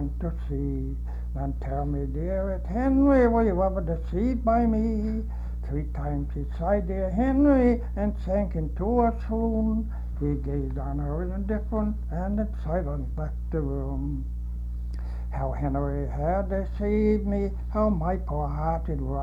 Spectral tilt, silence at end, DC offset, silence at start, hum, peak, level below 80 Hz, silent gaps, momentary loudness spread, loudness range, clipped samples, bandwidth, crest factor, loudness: -10.5 dB/octave; 0 s; under 0.1%; 0 s; none; -10 dBFS; -30 dBFS; none; 10 LU; 6 LU; under 0.1%; 5 kHz; 16 dB; -27 LUFS